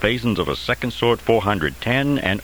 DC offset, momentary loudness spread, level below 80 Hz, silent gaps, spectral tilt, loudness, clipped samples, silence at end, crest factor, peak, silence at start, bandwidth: 0.5%; 4 LU; -40 dBFS; none; -6 dB/octave; -20 LUFS; under 0.1%; 0 s; 20 dB; 0 dBFS; 0 s; over 20 kHz